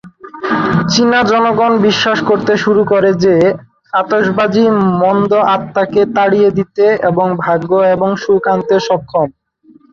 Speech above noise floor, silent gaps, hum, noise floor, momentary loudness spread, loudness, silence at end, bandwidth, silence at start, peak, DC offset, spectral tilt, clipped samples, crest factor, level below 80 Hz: 35 dB; none; none; -46 dBFS; 5 LU; -12 LUFS; 0.6 s; 7.4 kHz; 0.05 s; 0 dBFS; under 0.1%; -6 dB/octave; under 0.1%; 12 dB; -50 dBFS